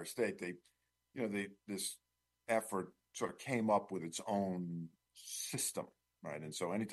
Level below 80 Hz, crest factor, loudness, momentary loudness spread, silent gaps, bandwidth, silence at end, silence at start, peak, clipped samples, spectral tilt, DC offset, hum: -82 dBFS; 22 dB; -40 LUFS; 17 LU; none; 12.5 kHz; 0 s; 0 s; -20 dBFS; under 0.1%; -4 dB/octave; under 0.1%; none